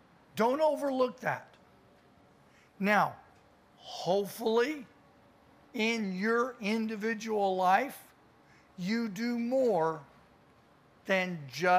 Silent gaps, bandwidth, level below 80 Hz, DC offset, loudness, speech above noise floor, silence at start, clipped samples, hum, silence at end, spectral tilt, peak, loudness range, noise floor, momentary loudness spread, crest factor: none; 15.5 kHz; -76 dBFS; under 0.1%; -31 LUFS; 32 dB; 0.35 s; under 0.1%; none; 0 s; -5 dB/octave; -12 dBFS; 3 LU; -62 dBFS; 13 LU; 20 dB